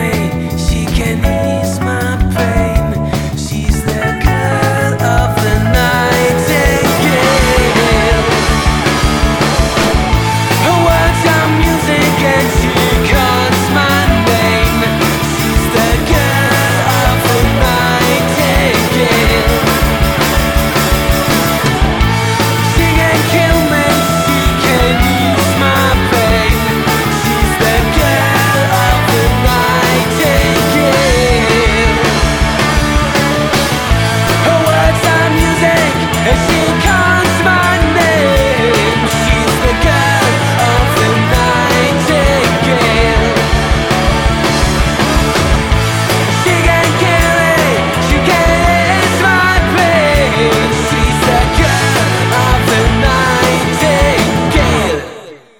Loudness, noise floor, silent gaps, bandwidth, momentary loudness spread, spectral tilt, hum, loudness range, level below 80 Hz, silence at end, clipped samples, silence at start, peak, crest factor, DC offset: -11 LUFS; -31 dBFS; none; over 20 kHz; 3 LU; -4.5 dB/octave; none; 1 LU; -20 dBFS; 0.25 s; under 0.1%; 0 s; 0 dBFS; 10 dB; under 0.1%